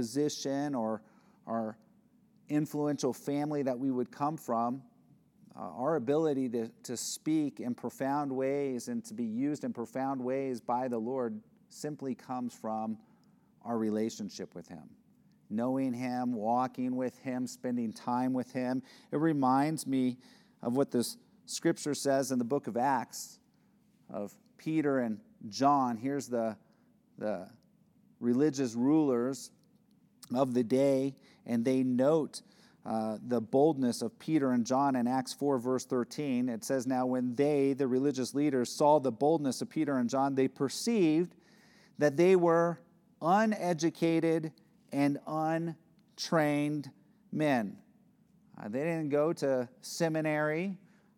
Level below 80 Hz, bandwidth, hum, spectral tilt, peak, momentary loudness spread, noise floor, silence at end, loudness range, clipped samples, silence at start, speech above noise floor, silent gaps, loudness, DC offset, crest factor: -86 dBFS; 17 kHz; none; -6 dB/octave; -14 dBFS; 13 LU; -67 dBFS; 0.4 s; 6 LU; under 0.1%; 0 s; 36 dB; none; -32 LUFS; under 0.1%; 18 dB